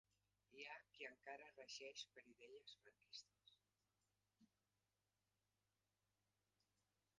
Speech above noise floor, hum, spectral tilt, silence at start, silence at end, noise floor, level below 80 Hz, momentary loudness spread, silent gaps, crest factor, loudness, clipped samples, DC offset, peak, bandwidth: over 28 dB; 50 Hz at -95 dBFS; -0.5 dB/octave; 0.5 s; 2.75 s; under -90 dBFS; under -90 dBFS; 10 LU; none; 24 dB; -59 LUFS; under 0.1%; under 0.1%; -42 dBFS; 8.8 kHz